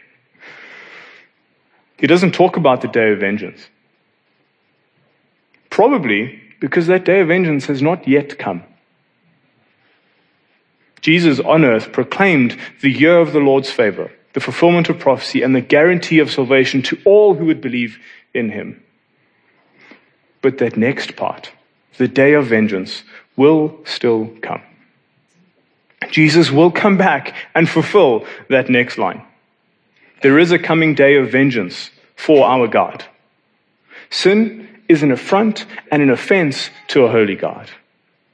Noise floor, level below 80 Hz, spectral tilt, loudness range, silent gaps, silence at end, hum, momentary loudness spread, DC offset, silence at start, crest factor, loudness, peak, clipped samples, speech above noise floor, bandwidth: -62 dBFS; -68 dBFS; -6.5 dB/octave; 7 LU; none; 0.6 s; none; 14 LU; under 0.1%; 0.45 s; 16 dB; -14 LUFS; 0 dBFS; under 0.1%; 48 dB; 10 kHz